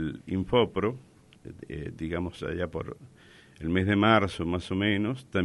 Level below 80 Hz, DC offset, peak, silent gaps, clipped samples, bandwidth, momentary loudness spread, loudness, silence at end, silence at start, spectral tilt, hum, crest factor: -52 dBFS; under 0.1%; -6 dBFS; none; under 0.1%; 11.5 kHz; 18 LU; -28 LUFS; 0 s; 0 s; -7 dB/octave; none; 22 dB